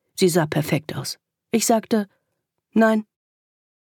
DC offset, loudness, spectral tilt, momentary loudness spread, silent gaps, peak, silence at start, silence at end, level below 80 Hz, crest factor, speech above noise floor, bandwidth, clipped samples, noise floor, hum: under 0.1%; -22 LUFS; -5 dB/octave; 12 LU; none; -4 dBFS; 0.15 s; 0.8 s; -66 dBFS; 18 dB; 57 dB; 19 kHz; under 0.1%; -77 dBFS; none